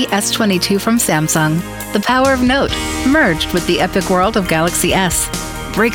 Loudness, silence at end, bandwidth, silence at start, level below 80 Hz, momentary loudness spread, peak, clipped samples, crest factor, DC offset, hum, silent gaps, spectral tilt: -14 LUFS; 0 s; 18 kHz; 0 s; -32 dBFS; 5 LU; -2 dBFS; under 0.1%; 12 dB; under 0.1%; none; none; -3.5 dB/octave